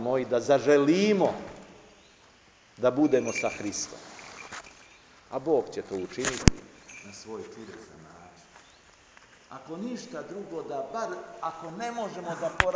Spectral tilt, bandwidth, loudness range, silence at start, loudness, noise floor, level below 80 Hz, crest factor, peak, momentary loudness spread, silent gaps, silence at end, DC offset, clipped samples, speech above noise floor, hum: -5 dB/octave; 8 kHz; 16 LU; 0 s; -28 LUFS; -58 dBFS; -46 dBFS; 30 dB; 0 dBFS; 22 LU; none; 0 s; under 0.1%; under 0.1%; 30 dB; none